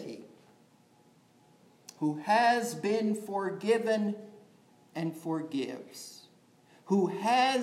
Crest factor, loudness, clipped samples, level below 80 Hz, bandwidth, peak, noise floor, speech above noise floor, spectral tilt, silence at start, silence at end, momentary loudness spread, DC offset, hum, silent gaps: 18 dB; -30 LUFS; under 0.1%; under -90 dBFS; 15.5 kHz; -14 dBFS; -63 dBFS; 33 dB; -5 dB/octave; 0 s; 0 s; 18 LU; under 0.1%; none; none